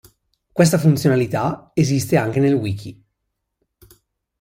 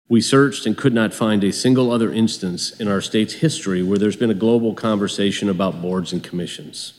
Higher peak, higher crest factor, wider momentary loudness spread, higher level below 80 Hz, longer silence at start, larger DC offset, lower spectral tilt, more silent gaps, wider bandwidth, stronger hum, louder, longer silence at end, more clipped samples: about the same, -2 dBFS vs -2 dBFS; about the same, 16 dB vs 16 dB; first, 13 LU vs 8 LU; first, -54 dBFS vs -64 dBFS; first, 0.55 s vs 0.1 s; neither; about the same, -6.5 dB/octave vs -5.5 dB/octave; neither; first, 16.5 kHz vs 13 kHz; neither; about the same, -18 LUFS vs -19 LUFS; first, 1.5 s vs 0.1 s; neither